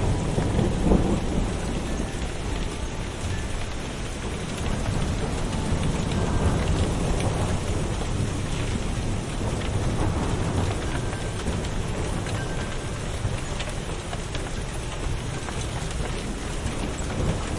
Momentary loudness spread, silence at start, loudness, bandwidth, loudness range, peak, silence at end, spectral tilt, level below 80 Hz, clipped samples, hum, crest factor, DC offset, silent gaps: 7 LU; 0 s; -28 LUFS; 11.5 kHz; 5 LU; -6 dBFS; 0 s; -5.5 dB/octave; -30 dBFS; under 0.1%; none; 20 dB; under 0.1%; none